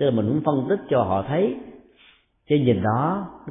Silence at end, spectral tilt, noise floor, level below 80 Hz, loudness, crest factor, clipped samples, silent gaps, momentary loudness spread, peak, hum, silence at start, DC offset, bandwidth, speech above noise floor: 0 s; -12.5 dB/octave; -56 dBFS; -56 dBFS; -22 LUFS; 16 dB; under 0.1%; none; 5 LU; -8 dBFS; none; 0 s; under 0.1%; 3.8 kHz; 35 dB